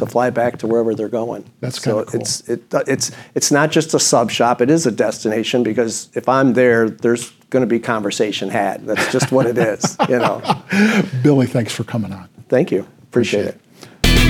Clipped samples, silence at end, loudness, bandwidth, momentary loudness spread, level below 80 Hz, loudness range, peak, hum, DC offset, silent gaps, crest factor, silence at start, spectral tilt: under 0.1%; 0 s; -17 LUFS; 18 kHz; 8 LU; -32 dBFS; 3 LU; 0 dBFS; none; under 0.1%; none; 16 dB; 0 s; -4.5 dB/octave